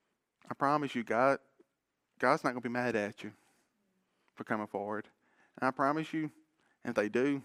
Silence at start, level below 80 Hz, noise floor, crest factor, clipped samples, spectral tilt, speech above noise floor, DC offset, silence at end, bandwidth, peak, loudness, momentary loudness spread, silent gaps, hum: 0.5 s; -80 dBFS; -83 dBFS; 24 dB; under 0.1%; -6 dB/octave; 51 dB; under 0.1%; 0 s; 14.5 kHz; -12 dBFS; -33 LUFS; 13 LU; none; none